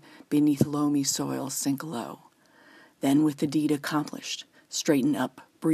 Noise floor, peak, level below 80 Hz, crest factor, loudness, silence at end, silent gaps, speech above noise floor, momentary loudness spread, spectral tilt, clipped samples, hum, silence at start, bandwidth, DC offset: -57 dBFS; -8 dBFS; -68 dBFS; 20 dB; -27 LUFS; 0 s; none; 30 dB; 11 LU; -4.5 dB/octave; under 0.1%; none; 0.15 s; 15.5 kHz; under 0.1%